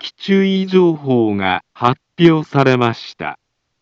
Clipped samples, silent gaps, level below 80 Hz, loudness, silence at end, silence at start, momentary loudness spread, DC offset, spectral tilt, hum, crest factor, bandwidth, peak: under 0.1%; none; -60 dBFS; -15 LUFS; 0.45 s; 0 s; 11 LU; under 0.1%; -7.5 dB/octave; none; 16 dB; 7.2 kHz; 0 dBFS